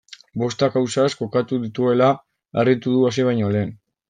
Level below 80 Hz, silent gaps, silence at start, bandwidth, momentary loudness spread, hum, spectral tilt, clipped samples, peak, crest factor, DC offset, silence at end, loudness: -62 dBFS; none; 0.35 s; 9.4 kHz; 9 LU; none; -6.5 dB/octave; under 0.1%; -4 dBFS; 16 dB; under 0.1%; 0.35 s; -20 LUFS